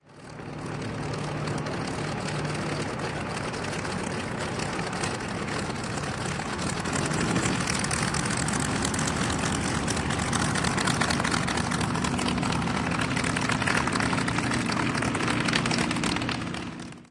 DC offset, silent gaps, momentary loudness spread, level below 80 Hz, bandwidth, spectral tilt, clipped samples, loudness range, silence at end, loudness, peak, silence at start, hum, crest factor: under 0.1%; none; 7 LU; -46 dBFS; 11.5 kHz; -4 dB/octave; under 0.1%; 5 LU; 0.05 s; -27 LUFS; -6 dBFS; 0.1 s; none; 22 dB